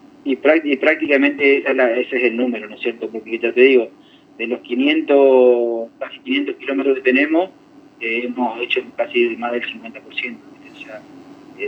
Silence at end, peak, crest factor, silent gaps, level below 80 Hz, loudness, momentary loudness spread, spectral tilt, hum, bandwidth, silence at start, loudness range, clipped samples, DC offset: 0 s; 0 dBFS; 18 dB; none; -72 dBFS; -17 LUFS; 15 LU; -5.5 dB/octave; none; 5.8 kHz; 0.25 s; 6 LU; under 0.1%; under 0.1%